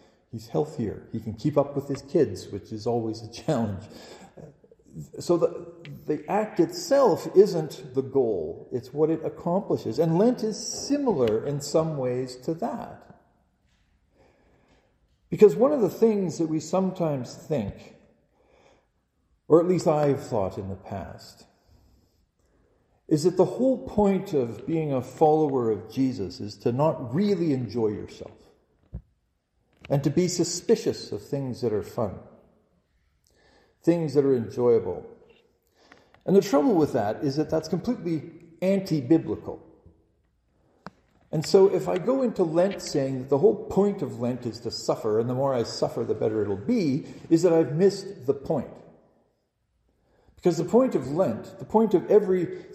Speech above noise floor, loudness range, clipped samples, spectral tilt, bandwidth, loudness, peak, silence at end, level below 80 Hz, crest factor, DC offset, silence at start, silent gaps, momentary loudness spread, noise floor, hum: 48 dB; 6 LU; under 0.1%; -6.5 dB/octave; 15 kHz; -25 LUFS; -4 dBFS; 0 s; -60 dBFS; 22 dB; under 0.1%; 0.35 s; none; 15 LU; -73 dBFS; none